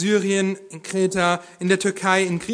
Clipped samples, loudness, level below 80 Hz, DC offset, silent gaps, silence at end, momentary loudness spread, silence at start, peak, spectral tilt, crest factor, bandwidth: under 0.1%; -21 LUFS; -60 dBFS; under 0.1%; none; 0 s; 6 LU; 0 s; -4 dBFS; -4.5 dB/octave; 18 dB; 11 kHz